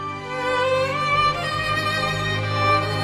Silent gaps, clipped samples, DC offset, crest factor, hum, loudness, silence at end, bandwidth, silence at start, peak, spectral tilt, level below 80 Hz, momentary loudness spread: none; under 0.1%; under 0.1%; 16 dB; none; -21 LUFS; 0 s; 15.5 kHz; 0 s; -6 dBFS; -4.5 dB/octave; -46 dBFS; 4 LU